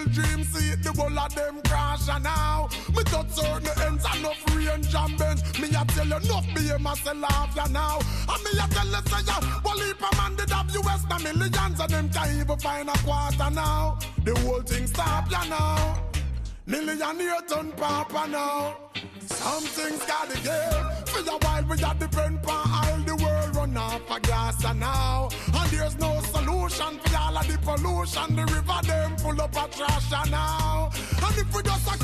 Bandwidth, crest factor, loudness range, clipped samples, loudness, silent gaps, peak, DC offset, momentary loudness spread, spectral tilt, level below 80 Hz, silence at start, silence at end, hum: 14.5 kHz; 12 dB; 2 LU; under 0.1%; -26 LUFS; none; -12 dBFS; under 0.1%; 3 LU; -4.5 dB/octave; -30 dBFS; 0 s; 0 s; none